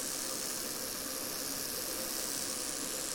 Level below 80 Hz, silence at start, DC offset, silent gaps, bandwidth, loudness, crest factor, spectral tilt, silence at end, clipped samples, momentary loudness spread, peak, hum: -64 dBFS; 0 s; under 0.1%; none; 17.5 kHz; -35 LUFS; 16 dB; -0.5 dB/octave; 0 s; under 0.1%; 2 LU; -22 dBFS; none